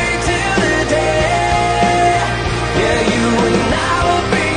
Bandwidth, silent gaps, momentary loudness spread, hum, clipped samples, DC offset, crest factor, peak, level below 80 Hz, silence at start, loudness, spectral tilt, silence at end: 10.5 kHz; none; 2 LU; none; under 0.1%; under 0.1%; 12 dB; -2 dBFS; -28 dBFS; 0 s; -14 LUFS; -4.5 dB/octave; 0 s